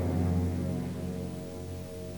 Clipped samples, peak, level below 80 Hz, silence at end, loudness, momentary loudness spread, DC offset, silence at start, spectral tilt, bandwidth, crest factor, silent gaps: under 0.1%; -18 dBFS; -48 dBFS; 0 s; -34 LUFS; 11 LU; 0.2%; 0 s; -8 dB/octave; 19.5 kHz; 14 dB; none